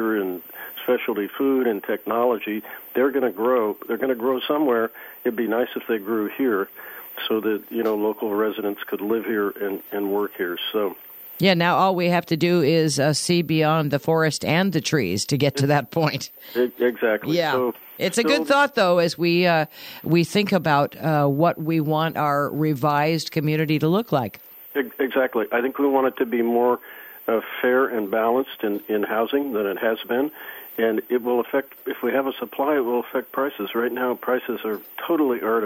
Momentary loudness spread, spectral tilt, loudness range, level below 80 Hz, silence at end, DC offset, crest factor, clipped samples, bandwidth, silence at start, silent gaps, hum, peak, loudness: 9 LU; -5.5 dB/octave; 5 LU; -66 dBFS; 0 s; under 0.1%; 16 dB; under 0.1%; 17 kHz; 0 s; none; none; -6 dBFS; -22 LUFS